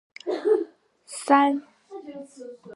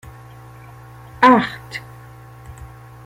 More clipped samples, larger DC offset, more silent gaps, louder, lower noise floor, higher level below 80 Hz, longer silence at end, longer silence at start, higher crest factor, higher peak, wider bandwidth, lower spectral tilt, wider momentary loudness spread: neither; neither; neither; second, -23 LUFS vs -15 LUFS; first, -48 dBFS vs -40 dBFS; second, -84 dBFS vs -48 dBFS; second, 0 s vs 0.4 s; second, 0.25 s vs 1.2 s; about the same, 22 dB vs 20 dB; about the same, -4 dBFS vs -2 dBFS; second, 11.5 kHz vs 16 kHz; second, -3 dB/octave vs -6 dB/octave; second, 23 LU vs 28 LU